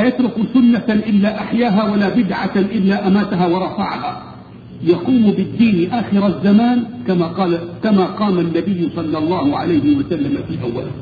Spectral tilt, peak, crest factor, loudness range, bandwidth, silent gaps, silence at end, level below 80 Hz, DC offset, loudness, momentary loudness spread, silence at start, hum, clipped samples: -9.5 dB/octave; -2 dBFS; 14 dB; 2 LU; 4.9 kHz; none; 0 s; -48 dBFS; under 0.1%; -16 LUFS; 8 LU; 0 s; none; under 0.1%